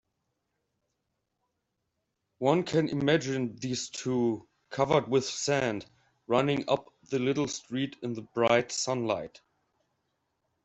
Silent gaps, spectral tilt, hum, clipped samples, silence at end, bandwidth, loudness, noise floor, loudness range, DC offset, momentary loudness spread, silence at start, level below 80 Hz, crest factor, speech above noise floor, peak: none; -4.5 dB/octave; none; under 0.1%; 1.35 s; 8.2 kHz; -29 LUFS; -82 dBFS; 3 LU; under 0.1%; 9 LU; 2.4 s; -68 dBFS; 22 dB; 53 dB; -8 dBFS